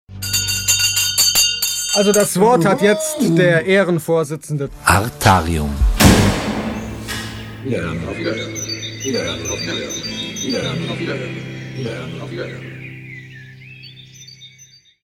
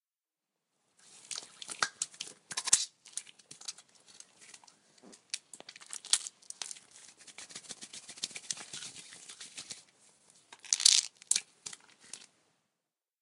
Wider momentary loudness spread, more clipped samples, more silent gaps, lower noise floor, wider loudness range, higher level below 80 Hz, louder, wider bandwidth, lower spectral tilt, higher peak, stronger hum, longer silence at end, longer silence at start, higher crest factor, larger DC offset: second, 19 LU vs 25 LU; neither; neither; second, -47 dBFS vs under -90 dBFS; about the same, 14 LU vs 12 LU; first, -30 dBFS vs -82 dBFS; first, -17 LUFS vs -32 LUFS; first, 19 kHz vs 15.5 kHz; first, -3.5 dB/octave vs 3 dB/octave; about the same, 0 dBFS vs -2 dBFS; neither; second, 0.4 s vs 1 s; second, 0.1 s vs 1.1 s; second, 18 dB vs 36 dB; neither